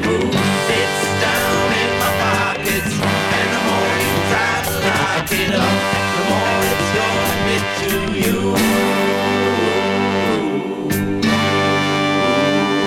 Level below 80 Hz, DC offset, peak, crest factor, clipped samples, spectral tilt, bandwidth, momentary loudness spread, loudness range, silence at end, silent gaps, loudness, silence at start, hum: -42 dBFS; under 0.1%; -4 dBFS; 14 dB; under 0.1%; -4 dB/octave; 17 kHz; 3 LU; 1 LU; 0 s; none; -16 LUFS; 0 s; none